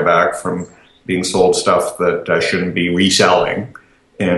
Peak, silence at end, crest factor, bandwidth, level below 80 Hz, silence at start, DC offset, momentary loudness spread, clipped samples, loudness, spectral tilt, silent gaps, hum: 0 dBFS; 0 s; 16 dB; 12.5 kHz; -50 dBFS; 0 s; under 0.1%; 13 LU; under 0.1%; -15 LUFS; -4 dB/octave; none; none